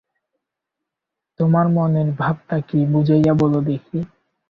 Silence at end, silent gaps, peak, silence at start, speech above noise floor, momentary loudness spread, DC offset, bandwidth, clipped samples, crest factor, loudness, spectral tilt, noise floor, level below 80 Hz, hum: 0.45 s; none; -4 dBFS; 1.4 s; 66 dB; 10 LU; under 0.1%; 5.6 kHz; under 0.1%; 16 dB; -18 LUFS; -10.5 dB/octave; -83 dBFS; -52 dBFS; none